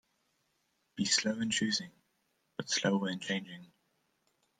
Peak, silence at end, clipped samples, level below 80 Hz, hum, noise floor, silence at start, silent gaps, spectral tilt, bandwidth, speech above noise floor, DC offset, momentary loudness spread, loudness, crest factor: -14 dBFS; 0.95 s; under 0.1%; -76 dBFS; none; -78 dBFS; 0.95 s; none; -3 dB/octave; 10.5 kHz; 44 dB; under 0.1%; 21 LU; -32 LUFS; 22 dB